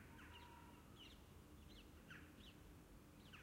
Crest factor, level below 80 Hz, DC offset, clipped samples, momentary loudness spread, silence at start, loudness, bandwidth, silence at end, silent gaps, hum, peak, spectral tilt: 16 dB; -70 dBFS; under 0.1%; under 0.1%; 4 LU; 0 s; -62 LUFS; 16 kHz; 0 s; none; none; -46 dBFS; -4.5 dB/octave